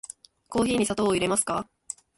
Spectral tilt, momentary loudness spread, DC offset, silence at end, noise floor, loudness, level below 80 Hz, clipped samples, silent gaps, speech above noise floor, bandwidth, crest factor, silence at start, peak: -3.5 dB/octave; 15 LU; under 0.1%; 0.55 s; -45 dBFS; -25 LUFS; -54 dBFS; under 0.1%; none; 20 dB; 12 kHz; 16 dB; 0.5 s; -12 dBFS